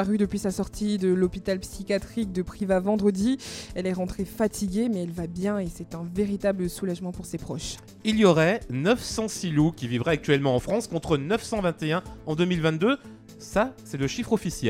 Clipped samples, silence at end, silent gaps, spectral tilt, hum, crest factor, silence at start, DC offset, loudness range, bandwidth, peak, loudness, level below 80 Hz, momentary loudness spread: under 0.1%; 0 s; none; -6 dB/octave; none; 20 dB; 0 s; under 0.1%; 5 LU; 16.5 kHz; -4 dBFS; -26 LUFS; -46 dBFS; 9 LU